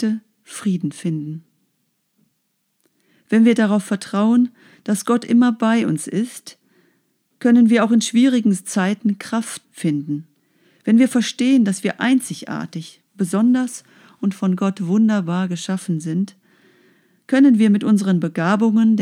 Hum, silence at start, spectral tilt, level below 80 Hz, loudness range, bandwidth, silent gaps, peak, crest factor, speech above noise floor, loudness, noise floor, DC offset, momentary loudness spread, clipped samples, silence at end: none; 0 s; -6 dB/octave; -80 dBFS; 4 LU; 13.5 kHz; none; -4 dBFS; 14 dB; 53 dB; -18 LUFS; -70 dBFS; under 0.1%; 14 LU; under 0.1%; 0 s